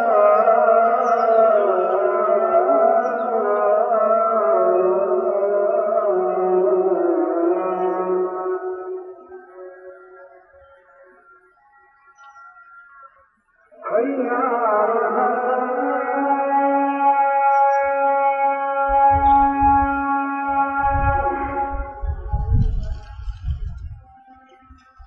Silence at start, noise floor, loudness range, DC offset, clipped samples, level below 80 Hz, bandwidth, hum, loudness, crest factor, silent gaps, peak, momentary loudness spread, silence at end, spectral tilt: 0 s; -59 dBFS; 10 LU; under 0.1%; under 0.1%; -34 dBFS; 6.2 kHz; none; -18 LUFS; 16 dB; none; -4 dBFS; 14 LU; 0.05 s; -9.5 dB/octave